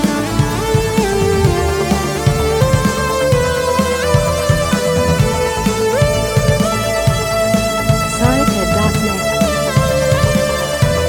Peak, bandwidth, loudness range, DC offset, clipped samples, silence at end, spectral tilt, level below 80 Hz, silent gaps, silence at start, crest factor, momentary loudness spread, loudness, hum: 0 dBFS; 19 kHz; 0 LU; under 0.1%; under 0.1%; 0 s; -5 dB/octave; -26 dBFS; none; 0 s; 14 dB; 2 LU; -15 LUFS; none